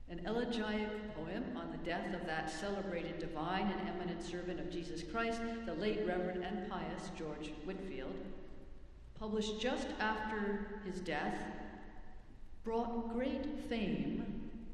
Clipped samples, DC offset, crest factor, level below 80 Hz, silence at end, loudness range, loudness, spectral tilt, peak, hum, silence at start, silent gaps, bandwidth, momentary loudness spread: under 0.1%; under 0.1%; 18 dB; -56 dBFS; 0 s; 2 LU; -41 LUFS; -5.5 dB/octave; -22 dBFS; none; 0 s; none; 11.5 kHz; 12 LU